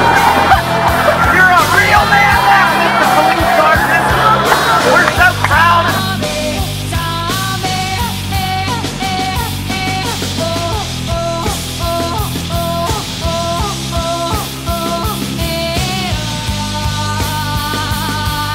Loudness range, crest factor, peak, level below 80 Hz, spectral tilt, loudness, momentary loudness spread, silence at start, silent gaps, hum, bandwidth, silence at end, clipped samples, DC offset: 8 LU; 14 dB; 0 dBFS; -28 dBFS; -4 dB/octave; -13 LUFS; 9 LU; 0 s; none; none; 16.5 kHz; 0 s; under 0.1%; under 0.1%